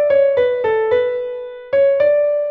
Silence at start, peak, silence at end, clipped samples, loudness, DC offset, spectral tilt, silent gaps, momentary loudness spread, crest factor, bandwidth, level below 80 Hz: 0 s; -6 dBFS; 0 s; under 0.1%; -16 LUFS; under 0.1%; -6 dB/octave; none; 10 LU; 10 dB; 4.5 kHz; -56 dBFS